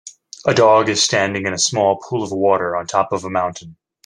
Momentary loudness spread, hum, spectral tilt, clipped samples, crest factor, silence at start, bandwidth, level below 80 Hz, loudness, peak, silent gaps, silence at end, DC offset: 10 LU; none; -3 dB/octave; under 0.1%; 16 dB; 0.05 s; 11.5 kHz; -60 dBFS; -17 LUFS; 0 dBFS; none; 0.35 s; under 0.1%